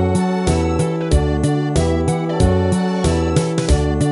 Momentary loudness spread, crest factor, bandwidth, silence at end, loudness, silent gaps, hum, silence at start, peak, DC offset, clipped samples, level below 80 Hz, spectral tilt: 2 LU; 14 dB; 11.5 kHz; 0 s; -17 LUFS; none; none; 0 s; -2 dBFS; 0.1%; under 0.1%; -24 dBFS; -6.5 dB/octave